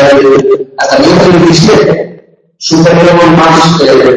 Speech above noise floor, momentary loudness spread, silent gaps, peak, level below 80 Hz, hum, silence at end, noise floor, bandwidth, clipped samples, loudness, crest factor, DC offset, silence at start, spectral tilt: 31 dB; 7 LU; none; 0 dBFS; -36 dBFS; none; 0 s; -36 dBFS; 11 kHz; 4%; -5 LUFS; 4 dB; under 0.1%; 0 s; -5.5 dB/octave